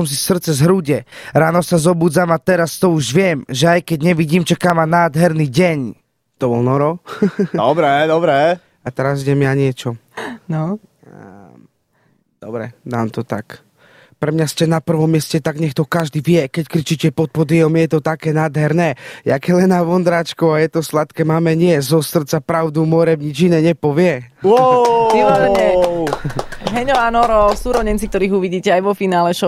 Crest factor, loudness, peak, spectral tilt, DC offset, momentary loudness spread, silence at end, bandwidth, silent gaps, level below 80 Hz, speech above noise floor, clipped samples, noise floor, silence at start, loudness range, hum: 14 dB; -15 LUFS; -2 dBFS; -6 dB/octave; under 0.1%; 9 LU; 0 s; 15.5 kHz; none; -40 dBFS; 45 dB; under 0.1%; -60 dBFS; 0 s; 8 LU; none